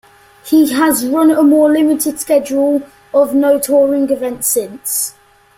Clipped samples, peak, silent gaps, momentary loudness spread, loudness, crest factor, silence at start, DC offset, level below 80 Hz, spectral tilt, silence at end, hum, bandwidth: under 0.1%; -2 dBFS; none; 7 LU; -13 LUFS; 12 dB; 0.45 s; under 0.1%; -56 dBFS; -3 dB/octave; 0.45 s; none; 16.5 kHz